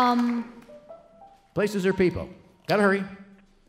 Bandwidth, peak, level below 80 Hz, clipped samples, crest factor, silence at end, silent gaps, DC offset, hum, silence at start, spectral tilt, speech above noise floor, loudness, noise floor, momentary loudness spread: 15.5 kHz; -8 dBFS; -54 dBFS; under 0.1%; 18 dB; 0.45 s; none; under 0.1%; none; 0 s; -6.5 dB/octave; 29 dB; -25 LUFS; -53 dBFS; 19 LU